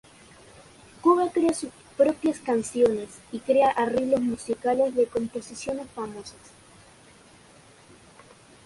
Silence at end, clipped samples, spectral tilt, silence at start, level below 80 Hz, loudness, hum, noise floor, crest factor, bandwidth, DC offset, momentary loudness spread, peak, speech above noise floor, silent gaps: 2.35 s; under 0.1%; -5 dB/octave; 1.05 s; -60 dBFS; -25 LUFS; none; -53 dBFS; 18 dB; 11.5 kHz; under 0.1%; 14 LU; -8 dBFS; 28 dB; none